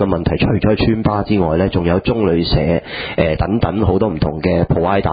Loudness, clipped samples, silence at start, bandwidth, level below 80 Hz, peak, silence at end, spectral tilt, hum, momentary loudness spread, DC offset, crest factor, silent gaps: -16 LUFS; under 0.1%; 0 s; 5 kHz; -28 dBFS; 0 dBFS; 0 s; -12.5 dB/octave; none; 3 LU; under 0.1%; 14 dB; none